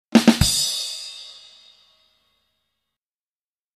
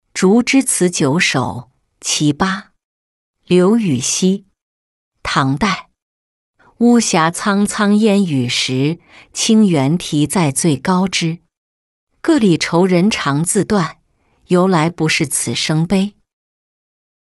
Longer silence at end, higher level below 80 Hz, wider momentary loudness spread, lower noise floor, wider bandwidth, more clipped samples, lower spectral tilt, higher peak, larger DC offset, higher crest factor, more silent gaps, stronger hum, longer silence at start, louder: first, 2.45 s vs 1.15 s; first, -40 dBFS vs -48 dBFS; first, 21 LU vs 9 LU; first, under -90 dBFS vs -57 dBFS; first, 15 kHz vs 12.5 kHz; neither; about the same, -3.5 dB/octave vs -4.5 dB/octave; about the same, 0 dBFS vs -2 dBFS; neither; first, 24 dB vs 14 dB; second, none vs 2.85-3.34 s, 4.63-5.12 s, 6.02-6.54 s, 11.57-12.07 s; neither; about the same, 0.1 s vs 0.15 s; second, -19 LUFS vs -15 LUFS